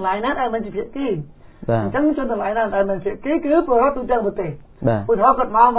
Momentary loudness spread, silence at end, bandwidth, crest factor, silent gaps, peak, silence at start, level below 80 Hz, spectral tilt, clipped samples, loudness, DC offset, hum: 11 LU; 0 s; 4 kHz; 18 dB; none; 0 dBFS; 0 s; -44 dBFS; -11 dB/octave; under 0.1%; -20 LUFS; under 0.1%; none